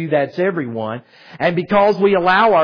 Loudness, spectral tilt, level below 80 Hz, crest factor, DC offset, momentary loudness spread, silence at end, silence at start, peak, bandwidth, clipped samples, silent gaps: -16 LUFS; -8 dB/octave; -54 dBFS; 14 dB; under 0.1%; 12 LU; 0 s; 0 s; -2 dBFS; 5.4 kHz; under 0.1%; none